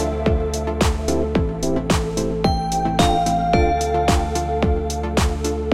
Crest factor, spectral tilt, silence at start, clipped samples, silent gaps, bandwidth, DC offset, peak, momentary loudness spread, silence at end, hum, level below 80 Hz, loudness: 16 dB; -5.5 dB/octave; 0 s; under 0.1%; none; 15.5 kHz; under 0.1%; -2 dBFS; 5 LU; 0 s; none; -26 dBFS; -20 LUFS